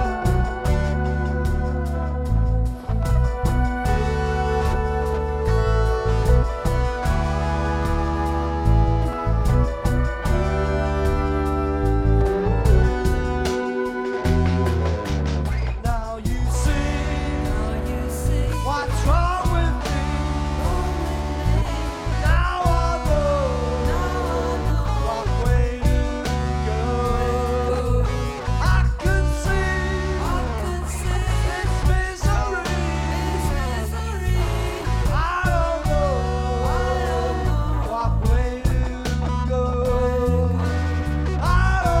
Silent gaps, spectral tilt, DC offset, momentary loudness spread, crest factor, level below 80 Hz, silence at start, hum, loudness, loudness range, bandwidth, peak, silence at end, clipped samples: none; -6.5 dB/octave; under 0.1%; 5 LU; 16 dB; -24 dBFS; 0 s; none; -22 LUFS; 2 LU; 14.5 kHz; -4 dBFS; 0 s; under 0.1%